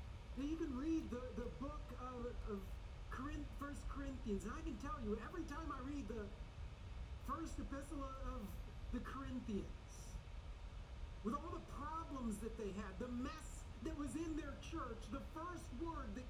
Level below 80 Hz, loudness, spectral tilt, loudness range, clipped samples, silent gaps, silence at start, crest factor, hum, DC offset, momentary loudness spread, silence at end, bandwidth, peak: -52 dBFS; -49 LUFS; -6.5 dB/octave; 2 LU; under 0.1%; none; 0 s; 16 dB; none; under 0.1%; 9 LU; 0 s; 15.5 kHz; -32 dBFS